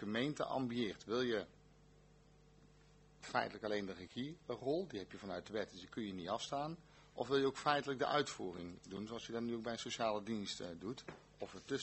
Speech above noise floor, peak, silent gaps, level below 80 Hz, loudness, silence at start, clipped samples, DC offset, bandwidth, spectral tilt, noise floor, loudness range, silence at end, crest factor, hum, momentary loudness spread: 25 dB; -18 dBFS; none; -72 dBFS; -42 LUFS; 0 s; under 0.1%; under 0.1%; 8.2 kHz; -4.5 dB/octave; -66 dBFS; 4 LU; 0 s; 24 dB; 50 Hz at -70 dBFS; 13 LU